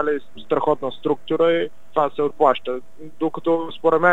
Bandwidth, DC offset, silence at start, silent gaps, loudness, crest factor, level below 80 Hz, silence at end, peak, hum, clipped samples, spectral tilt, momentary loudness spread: 7.8 kHz; 2%; 0 s; none; -21 LUFS; 18 dB; -62 dBFS; 0 s; -2 dBFS; none; under 0.1%; -7 dB/octave; 8 LU